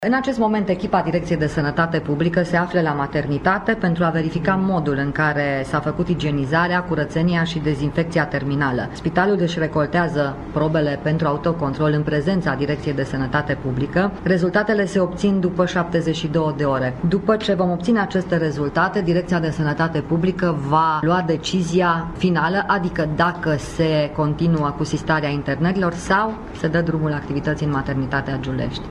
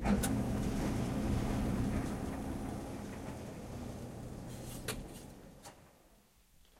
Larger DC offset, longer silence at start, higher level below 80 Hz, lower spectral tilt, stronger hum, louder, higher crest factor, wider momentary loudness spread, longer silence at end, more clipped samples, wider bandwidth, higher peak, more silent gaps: neither; about the same, 0 s vs 0 s; first, -40 dBFS vs -46 dBFS; about the same, -7 dB/octave vs -6 dB/octave; neither; first, -20 LUFS vs -39 LUFS; about the same, 16 dB vs 18 dB; second, 4 LU vs 15 LU; second, 0 s vs 0.65 s; neither; second, 10.5 kHz vs 16 kHz; first, -4 dBFS vs -20 dBFS; neither